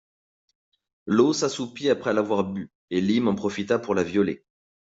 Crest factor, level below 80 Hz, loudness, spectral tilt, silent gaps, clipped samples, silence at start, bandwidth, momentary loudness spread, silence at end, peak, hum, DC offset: 18 dB; -64 dBFS; -24 LUFS; -5.5 dB/octave; 2.75-2.88 s; under 0.1%; 1.05 s; 8 kHz; 9 LU; 0.55 s; -6 dBFS; none; under 0.1%